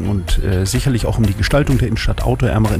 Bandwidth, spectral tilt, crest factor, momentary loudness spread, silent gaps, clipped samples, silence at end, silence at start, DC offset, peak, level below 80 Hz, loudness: 15.5 kHz; -6 dB/octave; 10 dB; 4 LU; none; under 0.1%; 0 s; 0 s; under 0.1%; -4 dBFS; -22 dBFS; -17 LUFS